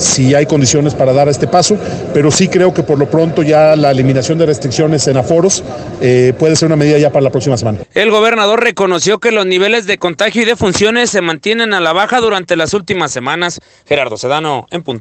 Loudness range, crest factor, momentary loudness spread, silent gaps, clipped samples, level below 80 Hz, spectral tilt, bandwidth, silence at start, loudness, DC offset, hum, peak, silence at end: 2 LU; 10 dB; 6 LU; none; under 0.1%; -44 dBFS; -4.5 dB/octave; 10 kHz; 0 s; -11 LUFS; under 0.1%; none; 0 dBFS; 0 s